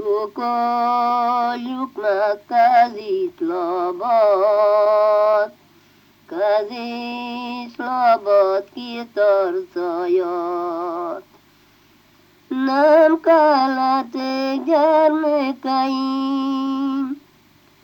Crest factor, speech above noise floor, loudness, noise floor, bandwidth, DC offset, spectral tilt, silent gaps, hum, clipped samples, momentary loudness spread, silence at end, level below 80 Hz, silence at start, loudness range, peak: 14 dB; 36 dB; -18 LUFS; -54 dBFS; 17 kHz; under 0.1%; -5 dB/octave; none; 50 Hz at -65 dBFS; under 0.1%; 13 LU; 0.65 s; -72 dBFS; 0 s; 6 LU; -4 dBFS